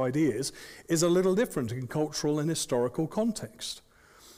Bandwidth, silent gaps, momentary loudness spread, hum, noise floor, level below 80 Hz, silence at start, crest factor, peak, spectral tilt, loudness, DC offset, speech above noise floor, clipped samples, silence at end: 16 kHz; none; 12 LU; none; -56 dBFS; -60 dBFS; 0 s; 14 dB; -16 dBFS; -5 dB/octave; -29 LUFS; under 0.1%; 27 dB; under 0.1%; 0.05 s